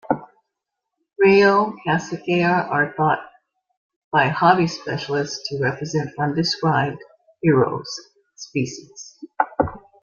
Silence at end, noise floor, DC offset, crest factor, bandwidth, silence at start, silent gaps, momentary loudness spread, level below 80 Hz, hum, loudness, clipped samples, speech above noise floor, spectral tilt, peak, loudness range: 0.25 s; -81 dBFS; under 0.1%; 20 dB; 7.4 kHz; 0.1 s; 3.77-3.89 s, 3.96-4.11 s; 13 LU; -56 dBFS; none; -20 LUFS; under 0.1%; 61 dB; -5.5 dB/octave; -2 dBFS; 4 LU